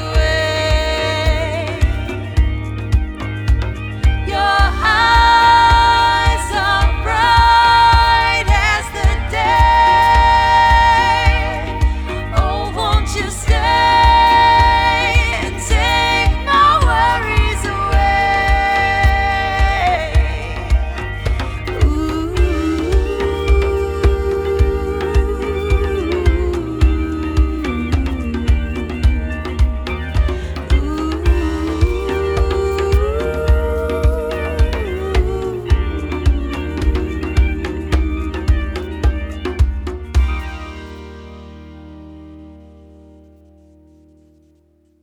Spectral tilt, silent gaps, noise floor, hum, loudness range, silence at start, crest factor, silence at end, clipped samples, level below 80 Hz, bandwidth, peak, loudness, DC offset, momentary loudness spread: -5.5 dB/octave; none; -55 dBFS; none; 8 LU; 0 s; 14 dB; 2.45 s; under 0.1%; -18 dBFS; 12 kHz; 0 dBFS; -15 LUFS; under 0.1%; 11 LU